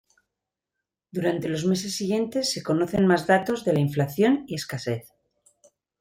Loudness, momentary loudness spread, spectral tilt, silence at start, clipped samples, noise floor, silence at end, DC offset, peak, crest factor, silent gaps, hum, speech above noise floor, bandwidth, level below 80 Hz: -24 LUFS; 9 LU; -5.5 dB/octave; 1.15 s; under 0.1%; -86 dBFS; 1 s; under 0.1%; -8 dBFS; 18 dB; none; none; 62 dB; 16.5 kHz; -62 dBFS